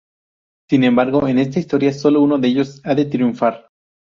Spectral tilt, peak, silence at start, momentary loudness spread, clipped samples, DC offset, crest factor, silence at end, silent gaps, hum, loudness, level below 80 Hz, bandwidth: -7.5 dB/octave; -2 dBFS; 0.7 s; 5 LU; under 0.1%; under 0.1%; 14 dB; 0.55 s; none; none; -16 LUFS; -56 dBFS; 7.2 kHz